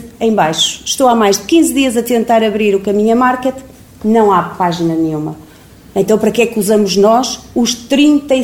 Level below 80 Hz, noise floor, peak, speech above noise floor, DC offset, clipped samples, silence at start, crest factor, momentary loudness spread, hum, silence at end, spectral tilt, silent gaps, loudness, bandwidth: -46 dBFS; -39 dBFS; 0 dBFS; 27 dB; 0.1%; under 0.1%; 0 s; 12 dB; 8 LU; none; 0 s; -4 dB/octave; none; -12 LUFS; 17 kHz